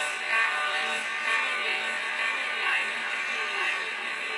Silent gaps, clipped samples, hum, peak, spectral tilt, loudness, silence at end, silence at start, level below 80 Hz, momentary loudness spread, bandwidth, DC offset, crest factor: none; under 0.1%; none; -14 dBFS; 1 dB/octave; -26 LUFS; 0 s; 0 s; -84 dBFS; 4 LU; 11.5 kHz; under 0.1%; 14 dB